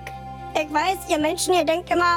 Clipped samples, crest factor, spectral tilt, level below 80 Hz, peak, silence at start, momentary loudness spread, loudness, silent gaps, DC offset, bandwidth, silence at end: under 0.1%; 12 dB; -3 dB/octave; -46 dBFS; -10 dBFS; 0 s; 10 LU; -22 LUFS; none; under 0.1%; 18 kHz; 0 s